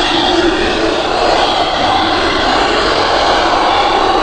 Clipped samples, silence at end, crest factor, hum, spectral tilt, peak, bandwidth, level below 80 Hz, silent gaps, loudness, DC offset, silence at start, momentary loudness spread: under 0.1%; 0 s; 12 dB; none; -3.5 dB/octave; 0 dBFS; 9.6 kHz; -30 dBFS; none; -12 LUFS; under 0.1%; 0 s; 2 LU